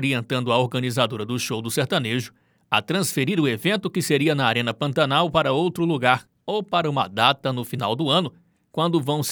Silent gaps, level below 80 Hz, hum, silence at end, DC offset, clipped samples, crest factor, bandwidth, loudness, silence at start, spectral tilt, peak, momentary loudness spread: none; -60 dBFS; none; 0 s; under 0.1%; under 0.1%; 22 dB; over 20 kHz; -22 LUFS; 0 s; -4.5 dB/octave; -2 dBFS; 7 LU